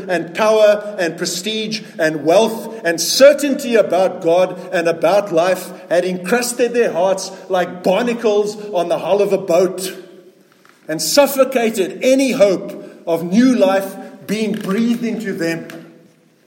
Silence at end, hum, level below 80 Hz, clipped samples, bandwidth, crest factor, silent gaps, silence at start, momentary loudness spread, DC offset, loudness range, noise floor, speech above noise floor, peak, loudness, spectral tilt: 0.6 s; none; -68 dBFS; under 0.1%; 17 kHz; 16 dB; none; 0 s; 9 LU; under 0.1%; 3 LU; -50 dBFS; 34 dB; 0 dBFS; -16 LUFS; -4 dB/octave